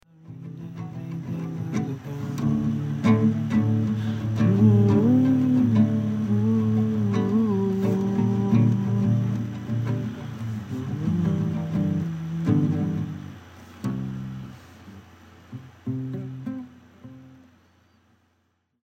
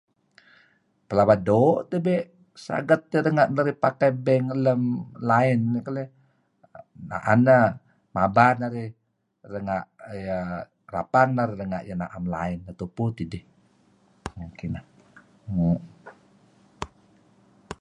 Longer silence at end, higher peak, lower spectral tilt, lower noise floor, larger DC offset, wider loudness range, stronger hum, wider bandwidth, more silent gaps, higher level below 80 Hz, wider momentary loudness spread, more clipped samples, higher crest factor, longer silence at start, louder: first, 1.55 s vs 0.05 s; second, -6 dBFS vs -2 dBFS; about the same, -9 dB/octave vs -8.5 dB/octave; first, -71 dBFS vs -63 dBFS; neither; first, 16 LU vs 10 LU; neither; second, 8 kHz vs 10.5 kHz; neither; second, -58 dBFS vs -52 dBFS; second, 17 LU vs 20 LU; neither; second, 18 dB vs 24 dB; second, 0.25 s vs 1.1 s; about the same, -24 LUFS vs -24 LUFS